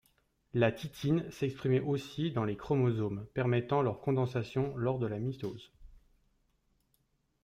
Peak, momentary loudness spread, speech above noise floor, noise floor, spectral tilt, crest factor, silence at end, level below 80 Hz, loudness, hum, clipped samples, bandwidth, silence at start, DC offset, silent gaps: -16 dBFS; 7 LU; 43 dB; -76 dBFS; -8 dB/octave; 18 dB; 1.5 s; -62 dBFS; -33 LUFS; none; under 0.1%; 15 kHz; 0.55 s; under 0.1%; none